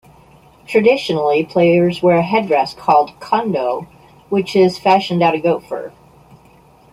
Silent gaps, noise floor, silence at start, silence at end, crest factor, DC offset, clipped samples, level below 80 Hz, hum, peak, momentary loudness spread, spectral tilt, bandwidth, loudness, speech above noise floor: none; -47 dBFS; 0.7 s; 1.05 s; 16 dB; under 0.1%; under 0.1%; -56 dBFS; none; 0 dBFS; 8 LU; -6.5 dB/octave; 15 kHz; -15 LUFS; 33 dB